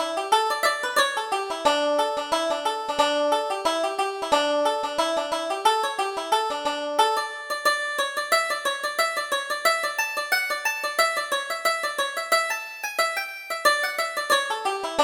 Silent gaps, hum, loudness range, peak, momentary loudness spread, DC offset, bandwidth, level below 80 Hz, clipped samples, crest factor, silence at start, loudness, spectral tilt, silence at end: none; none; 1 LU; -6 dBFS; 5 LU; under 0.1%; over 20 kHz; -64 dBFS; under 0.1%; 18 dB; 0 s; -24 LUFS; 0 dB/octave; 0 s